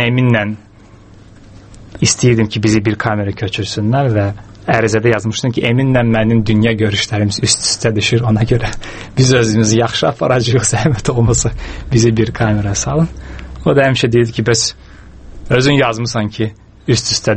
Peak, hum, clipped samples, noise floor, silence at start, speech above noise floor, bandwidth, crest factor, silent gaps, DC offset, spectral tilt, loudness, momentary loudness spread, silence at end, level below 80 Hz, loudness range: 0 dBFS; none; under 0.1%; -40 dBFS; 0 s; 27 dB; 8.8 kHz; 14 dB; none; under 0.1%; -5 dB/octave; -14 LUFS; 8 LU; 0 s; -32 dBFS; 2 LU